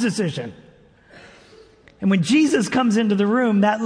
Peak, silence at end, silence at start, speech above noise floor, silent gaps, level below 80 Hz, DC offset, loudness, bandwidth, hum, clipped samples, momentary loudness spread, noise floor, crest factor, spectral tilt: -6 dBFS; 0 s; 0 s; 32 dB; none; -60 dBFS; under 0.1%; -19 LUFS; 10.5 kHz; none; under 0.1%; 9 LU; -50 dBFS; 14 dB; -5.5 dB/octave